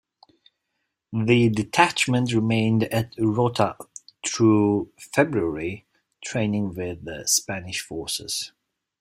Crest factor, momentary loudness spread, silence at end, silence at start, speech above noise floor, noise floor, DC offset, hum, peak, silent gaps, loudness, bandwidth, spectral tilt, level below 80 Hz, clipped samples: 22 dB; 13 LU; 0.55 s; 1.1 s; 56 dB; -78 dBFS; under 0.1%; none; -2 dBFS; none; -23 LUFS; 16 kHz; -4.5 dB/octave; -56 dBFS; under 0.1%